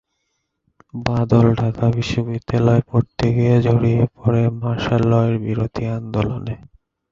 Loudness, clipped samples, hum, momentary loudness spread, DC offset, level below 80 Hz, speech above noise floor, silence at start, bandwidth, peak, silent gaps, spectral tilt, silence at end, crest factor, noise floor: -18 LUFS; under 0.1%; none; 9 LU; under 0.1%; -40 dBFS; 55 dB; 0.95 s; 7.4 kHz; -2 dBFS; none; -8.5 dB/octave; 0.55 s; 16 dB; -73 dBFS